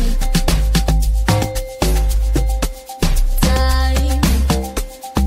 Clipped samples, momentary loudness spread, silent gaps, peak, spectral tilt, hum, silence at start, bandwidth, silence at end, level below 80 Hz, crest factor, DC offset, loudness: under 0.1%; 7 LU; none; -2 dBFS; -5 dB/octave; none; 0 s; 16.5 kHz; 0 s; -16 dBFS; 14 dB; under 0.1%; -18 LUFS